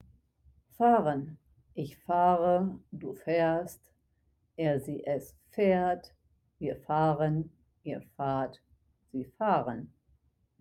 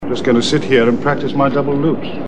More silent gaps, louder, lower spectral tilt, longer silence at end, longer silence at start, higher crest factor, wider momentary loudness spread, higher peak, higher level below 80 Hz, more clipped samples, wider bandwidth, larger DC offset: neither; second, -30 LUFS vs -15 LUFS; first, -8 dB/octave vs -6 dB/octave; first, 0.75 s vs 0 s; first, 0.8 s vs 0 s; first, 20 dB vs 14 dB; first, 17 LU vs 4 LU; second, -12 dBFS vs 0 dBFS; second, -64 dBFS vs -46 dBFS; neither; first, 15.5 kHz vs 10 kHz; second, under 0.1% vs 5%